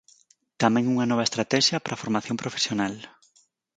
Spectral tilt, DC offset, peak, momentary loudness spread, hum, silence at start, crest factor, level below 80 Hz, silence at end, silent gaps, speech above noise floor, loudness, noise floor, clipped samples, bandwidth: -4 dB/octave; under 0.1%; -4 dBFS; 9 LU; none; 0.6 s; 22 dB; -66 dBFS; 0.7 s; none; 40 dB; -24 LUFS; -64 dBFS; under 0.1%; 9.4 kHz